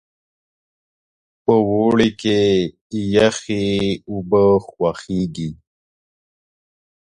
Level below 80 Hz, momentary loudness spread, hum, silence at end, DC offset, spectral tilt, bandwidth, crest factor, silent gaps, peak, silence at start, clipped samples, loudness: -48 dBFS; 10 LU; none; 1.65 s; under 0.1%; -6 dB/octave; 10.5 kHz; 20 dB; 2.81-2.90 s; 0 dBFS; 1.5 s; under 0.1%; -18 LUFS